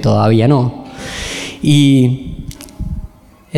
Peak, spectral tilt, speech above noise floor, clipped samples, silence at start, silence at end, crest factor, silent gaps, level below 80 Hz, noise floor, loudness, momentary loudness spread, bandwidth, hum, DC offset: 0 dBFS; -6.5 dB/octave; 25 dB; under 0.1%; 0 s; 0 s; 14 dB; none; -32 dBFS; -36 dBFS; -13 LUFS; 18 LU; 13 kHz; none; under 0.1%